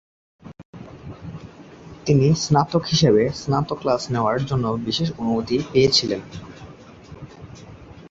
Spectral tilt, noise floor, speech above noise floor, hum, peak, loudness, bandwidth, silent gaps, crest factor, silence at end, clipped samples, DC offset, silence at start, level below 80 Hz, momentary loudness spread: -5.5 dB/octave; -42 dBFS; 23 dB; none; -4 dBFS; -20 LUFS; 8 kHz; 0.65-0.73 s; 18 dB; 0 s; under 0.1%; under 0.1%; 0.45 s; -48 dBFS; 24 LU